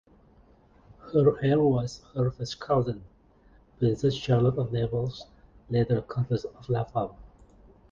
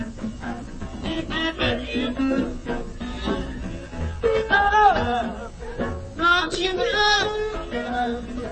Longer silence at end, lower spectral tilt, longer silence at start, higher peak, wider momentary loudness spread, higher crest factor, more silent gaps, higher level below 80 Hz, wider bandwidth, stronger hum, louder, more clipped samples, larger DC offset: first, 0.65 s vs 0 s; first, -8 dB/octave vs -4.5 dB/octave; first, 1.05 s vs 0 s; second, -10 dBFS vs -4 dBFS; second, 11 LU vs 15 LU; about the same, 18 dB vs 20 dB; neither; second, -52 dBFS vs -36 dBFS; second, 7.4 kHz vs 8.8 kHz; neither; second, -27 LUFS vs -23 LUFS; neither; neither